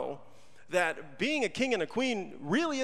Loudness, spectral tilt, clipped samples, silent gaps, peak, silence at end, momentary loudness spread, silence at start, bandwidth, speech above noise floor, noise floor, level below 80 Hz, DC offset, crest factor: -31 LUFS; -4 dB/octave; under 0.1%; none; -14 dBFS; 0 s; 6 LU; 0 s; 14.5 kHz; 28 dB; -59 dBFS; -72 dBFS; 0.4%; 18 dB